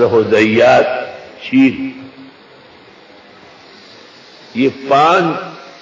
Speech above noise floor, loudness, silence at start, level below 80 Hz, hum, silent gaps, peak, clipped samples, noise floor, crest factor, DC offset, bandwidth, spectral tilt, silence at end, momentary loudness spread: 30 dB; -12 LUFS; 0 s; -52 dBFS; none; none; 0 dBFS; under 0.1%; -41 dBFS; 14 dB; under 0.1%; 7.6 kHz; -6 dB/octave; 0.1 s; 19 LU